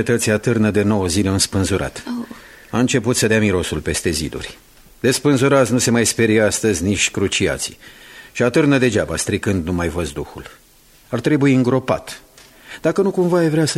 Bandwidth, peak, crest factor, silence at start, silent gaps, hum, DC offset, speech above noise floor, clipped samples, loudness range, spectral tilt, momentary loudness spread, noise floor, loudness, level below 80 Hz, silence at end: 15.5 kHz; -2 dBFS; 16 dB; 0 s; none; none; under 0.1%; 23 dB; under 0.1%; 4 LU; -4.5 dB/octave; 13 LU; -40 dBFS; -17 LUFS; -42 dBFS; 0 s